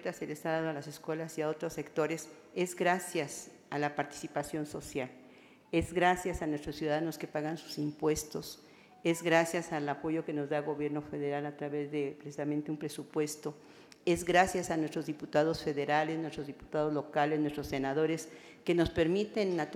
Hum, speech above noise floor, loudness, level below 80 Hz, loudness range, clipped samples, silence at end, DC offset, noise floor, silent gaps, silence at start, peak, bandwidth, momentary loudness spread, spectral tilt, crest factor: none; 25 dB; -34 LUFS; -60 dBFS; 4 LU; under 0.1%; 0 s; under 0.1%; -58 dBFS; none; 0 s; -12 dBFS; 16.5 kHz; 11 LU; -5 dB/octave; 22 dB